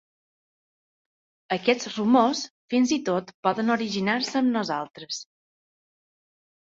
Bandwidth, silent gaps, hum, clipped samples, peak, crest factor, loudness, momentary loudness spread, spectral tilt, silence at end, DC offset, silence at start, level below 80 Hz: 7.8 kHz; 2.50-2.68 s, 3.34-3.43 s, 4.90-4.94 s; none; under 0.1%; -6 dBFS; 20 dB; -25 LUFS; 11 LU; -4.5 dB/octave; 1.55 s; under 0.1%; 1.5 s; -70 dBFS